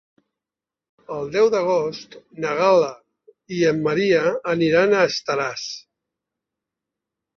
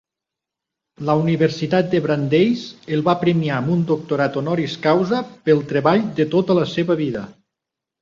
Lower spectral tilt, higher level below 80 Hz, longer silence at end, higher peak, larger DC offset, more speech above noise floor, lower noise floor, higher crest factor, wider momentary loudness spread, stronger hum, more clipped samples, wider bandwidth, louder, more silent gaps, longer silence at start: second, -5 dB/octave vs -7.5 dB/octave; second, -64 dBFS vs -58 dBFS; first, 1.6 s vs 0.7 s; about the same, -4 dBFS vs -2 dBFS; neither; about the same, 69 dB vs 67 dB; first, -89 dBFS vs -85 dBFS; about the same, 18 dB vs 16 dB; first, 15 LU vs 5 LU; neither; neither; about the same, 7.2 kHz vs 7.4 kHz; about the same, -20 LUFS vs -19 LUFS; neither; about the same, 1.1 s vs 1 s